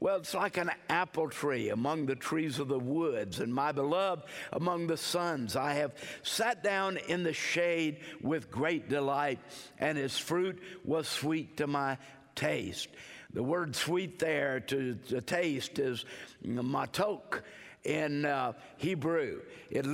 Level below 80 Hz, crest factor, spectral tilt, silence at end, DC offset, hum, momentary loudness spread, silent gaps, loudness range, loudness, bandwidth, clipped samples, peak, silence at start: -72 dBFS; 20 dB; -4.5 dB/octave; 0 s; under 0.1%; none; 8 LU; none; 2 LU; -33 LUFS; 16 kHz; under 0.1%; -14 dBFS; 0 s